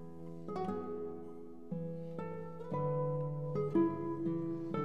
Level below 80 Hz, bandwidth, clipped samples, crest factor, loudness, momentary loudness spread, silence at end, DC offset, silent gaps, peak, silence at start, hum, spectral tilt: -78 dBFS; 6 kHz; under 0.1%; 18 dB; -39 LUFS; 14 LU; 0 s; 0.3%; none; -20 dBFS; 0 s; none; -10.5 dB/octave